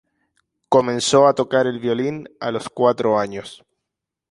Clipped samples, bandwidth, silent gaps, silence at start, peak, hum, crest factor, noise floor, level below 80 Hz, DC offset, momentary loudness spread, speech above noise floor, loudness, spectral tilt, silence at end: under 0.1%; 11.5 kHz; none; 0.7 s; -2 dBFS; none; 18 dB; -83 dBFS; -62 dBFS; under 0.1%; 13 LU; 64 dB; -19 LUFS; -4.5 dB/octave; 0.75 s